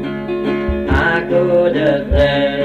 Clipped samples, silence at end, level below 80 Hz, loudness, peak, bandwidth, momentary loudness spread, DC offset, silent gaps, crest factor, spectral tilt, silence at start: under 0.1%; 0 s; -24 dBFS; -15 LUFS; -4 dBFS; 8.4 kHz; 6 LU; under 0.1%; none; 10 dB; -7.5 dB/octave; 0 s